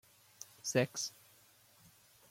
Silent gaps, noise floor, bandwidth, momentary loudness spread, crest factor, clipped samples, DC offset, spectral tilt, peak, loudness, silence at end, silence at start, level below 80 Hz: none; -65 dBFS; 16.5 kHz; 20 LU; 24 dB; under 0.1%; under 0.1%; -3.5 dB/octave; -18 dBFS; -37 LUFS; 1.2 s; 0.4 s; -80 dBFS